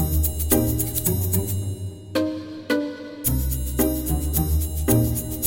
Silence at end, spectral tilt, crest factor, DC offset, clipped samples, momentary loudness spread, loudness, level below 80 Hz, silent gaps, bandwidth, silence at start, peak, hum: 0 s; -5.5 dB/octave; 18 dB; under 0.1%; under 0.1%; 8 LU; -23 LUFS; -28 dBFS; none; 17 kHz; 0 s; -4 dBFS; none